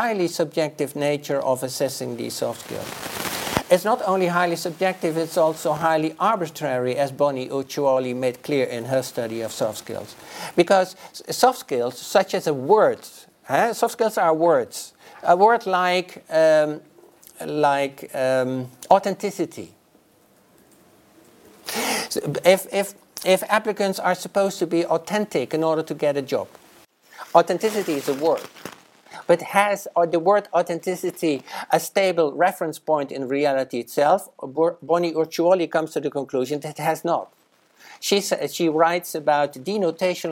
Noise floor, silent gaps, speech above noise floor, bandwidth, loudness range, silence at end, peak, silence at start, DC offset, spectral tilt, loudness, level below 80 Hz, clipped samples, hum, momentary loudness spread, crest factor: -57 dBFS; none; 36 dB; 17 kHz; 4 LU; 0 s; 0 dBFS; 0 s; under 0.1%; -4.5 dB/octave; -22 LUFS; -64 dBFS; under 0.1%; none; 10 LU; 22 dB